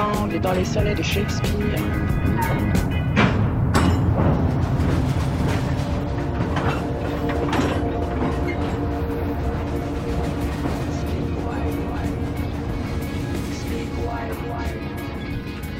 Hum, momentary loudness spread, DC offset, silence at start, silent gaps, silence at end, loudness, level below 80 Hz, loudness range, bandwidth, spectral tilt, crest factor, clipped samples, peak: none; 8 LU; under 0.1%; 0 s; none; 0 s; -23 LUFS; -30 dBFS; 6 LU; 16.5 kHz; -7 dB/octave; 18 dB; under 0.1%; -4 dBFS